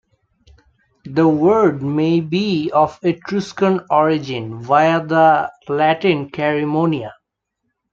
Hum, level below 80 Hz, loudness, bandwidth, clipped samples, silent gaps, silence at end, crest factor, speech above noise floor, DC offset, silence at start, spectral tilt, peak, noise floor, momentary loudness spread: none; -58 dBFS; -17 LUFS; 7.4 kHz; under 0.1%; none; 0.8 s; 16 dB; 59 dB; under 0.1%; 1.05 s; -7 dB/octave; -2 dBFS; -75 dBFS; 9 LU